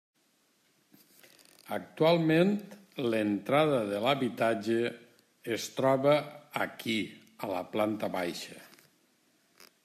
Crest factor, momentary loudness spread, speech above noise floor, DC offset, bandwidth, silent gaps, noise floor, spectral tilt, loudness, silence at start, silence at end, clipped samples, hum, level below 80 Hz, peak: 18 dB; 16 LU; 42 dB; under 0.1%; 15 kHz; none; -71 dBFS; -5.5 dB/octave; -30 LUFS; 1.7 s; 0.2 s; under 0.1%; none; -78 dBFS; -12 dBFS